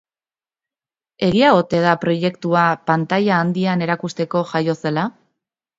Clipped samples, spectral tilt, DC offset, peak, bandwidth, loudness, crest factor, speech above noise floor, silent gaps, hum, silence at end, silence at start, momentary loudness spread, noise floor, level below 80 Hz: under 0.1%; -7 dB/octave; under 0.1%; 0 dBFS; 7.8 kHz; -18 LUFS; 18 dB; over 73 dB; none; none; 0.7 s; 1.2 s; 8 LU; under -90 dBFS; -56 dBFS